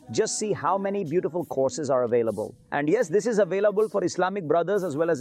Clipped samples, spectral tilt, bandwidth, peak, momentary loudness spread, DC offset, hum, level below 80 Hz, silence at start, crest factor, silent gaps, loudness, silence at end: under 0.1%; -5 dB/octave; 14 kHz; -12 dBFS; 4 LU; under 0.1%; none; -70 dBFS; 0.1 s; 12 dB; none; -25 LUFS; 0 s